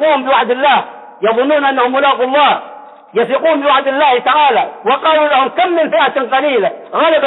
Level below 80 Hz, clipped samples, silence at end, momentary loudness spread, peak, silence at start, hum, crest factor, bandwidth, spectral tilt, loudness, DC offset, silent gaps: -62 dBFS; under 0.1%; 0 s; 5 LU; -2 dBFS; 0 s; none; 10 dB; 4.1 kHz; -6.5 dB/octave; -12 LUFS; under 0.1%; none